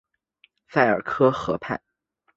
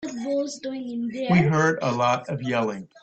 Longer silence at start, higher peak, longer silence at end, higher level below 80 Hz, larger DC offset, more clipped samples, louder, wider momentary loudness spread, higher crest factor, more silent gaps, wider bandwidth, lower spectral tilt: first, 0.7 s vs 0 s; first, -2 dBFS vs -8 dBFS; first, 0.6 s vs 0.15 s; about the same, -58 dBFS vs -58 dBFS; neither; neither; about the same, -23 LUFS vs -24 LUFS; about the same, 11 LU vs 10 LU; about the same, 22 dB vs 18 dB; neither; about the same, 7.8 kHz vs 8.4 kHz; about the same, -7 dB/octave vs -6 dB/octave